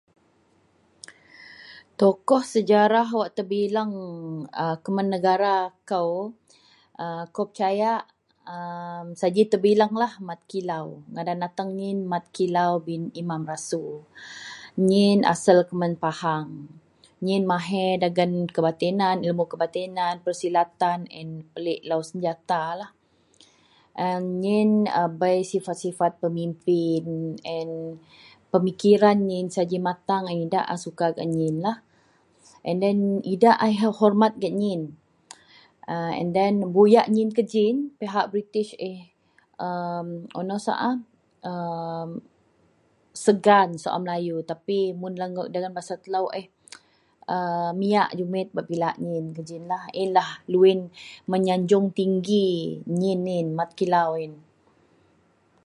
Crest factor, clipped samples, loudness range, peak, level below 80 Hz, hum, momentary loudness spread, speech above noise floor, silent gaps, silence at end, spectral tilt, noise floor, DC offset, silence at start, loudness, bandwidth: 22 dB; under 0.1%; 6 LU; -4 dBFS; -72 dBFS; none; 15 LU; 40 dB; none; 1.25 s; -6.5 dB/octave; -63 dBFS; under 0.1%; 1.1 s; -24 LUFS; 11.5 kHz